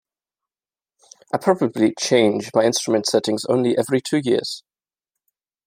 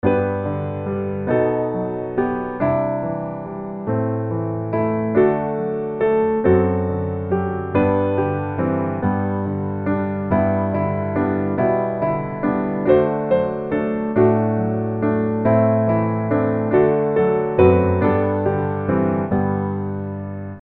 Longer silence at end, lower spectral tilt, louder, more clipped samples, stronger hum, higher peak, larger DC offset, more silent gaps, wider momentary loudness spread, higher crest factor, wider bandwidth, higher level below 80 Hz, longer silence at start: first, 1.05 s vs 0 s; second, -4.5 dB/octave vs -12 dB/octave; about the same, -20 LUFS vs -20 LUFS; neither; neither; about the same, -2 dBFS vs -2 dBFS; neither; neither; second, 5 LU vs 8 LU; about the same, 18 dB vs 18 dB; first, 16 kHz vs 4.2 kHz; second, -68 dBFS vs -46 dBFS; first, 1.35 s vs 0.05 s